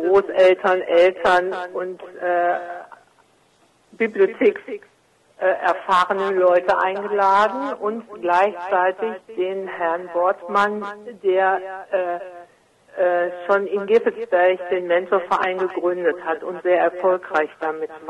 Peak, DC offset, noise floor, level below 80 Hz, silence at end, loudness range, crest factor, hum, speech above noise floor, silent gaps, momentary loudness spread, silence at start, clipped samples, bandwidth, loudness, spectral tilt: -6 dBFS; under 0.1%; -59 dBFS; -64 dBFS; 0 s; 4 LU; 16 dB; none; 39 dB; none; 11 LU; 0 s; under 0.1%; 10.5 kHz; -20 LUFS; -5.5 dB/octave